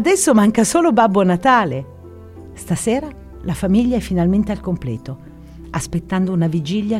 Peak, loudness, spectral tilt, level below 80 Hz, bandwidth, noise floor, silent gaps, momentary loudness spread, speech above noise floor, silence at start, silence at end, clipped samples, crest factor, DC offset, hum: -2 dBFS; -17 LUFS; -5.5 dB/octave; -38 dBFS; 15.5 kHz; -37 dBFS; none; 17 LU; 21 dB; 0 s; 0 s; under 0.1%; 16 dB; under 0.1%; none